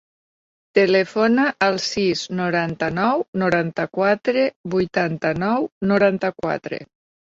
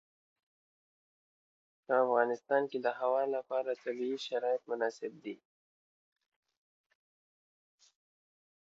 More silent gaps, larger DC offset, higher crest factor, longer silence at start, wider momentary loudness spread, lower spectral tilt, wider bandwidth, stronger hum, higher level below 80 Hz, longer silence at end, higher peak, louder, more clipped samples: first, 3.28-3.33 s, 4.56-4.64 s, 5.72-5.81 s vs none; neither; about the same, 18 dB vs 22 dB; second, 0.75 s vs 1.9 s; second, 6 LU vs 13 LU; first, -5.5 dB/octave vs -2 dB/octave; about the same, 7.8 kHz vs 7.6 kHz; neither; first, -56 dBFS vs under -90 dBFS; second, 0.45 s vs 3.3 s; first, -2 dBFS vs -16 dBFS; first, -20 LUFS vs -34 LUFS; neither